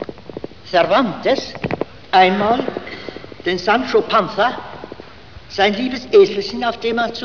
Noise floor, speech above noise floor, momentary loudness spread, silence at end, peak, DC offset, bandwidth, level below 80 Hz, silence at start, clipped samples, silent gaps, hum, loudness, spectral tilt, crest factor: -40 dBFS; 24 dB; 20 LU; 0 s; -2 dBFS; 0.7%; 5.4 kHz; -50 dBFS; 0 s; under 0.1%; none; none; -17 LUFS; -5 dB/octave; 16 dB